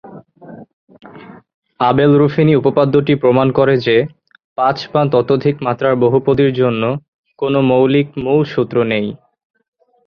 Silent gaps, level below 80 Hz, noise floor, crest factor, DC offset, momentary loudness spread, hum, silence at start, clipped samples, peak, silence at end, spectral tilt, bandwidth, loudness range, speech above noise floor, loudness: 0.73-0.87 s, 1.54-1.62 s, 4.44-4.56 s, 7.08-7.24 s; -50 dBFS; -37 dBFS; 14 dB; under 0.1%; 7 LU; none; 0.05 s; under 0.1%; 0 dBFS; 0.9 s; -9 dB/octave; 6.4 kHz; 2 LU; 24 dB; -14 LUFS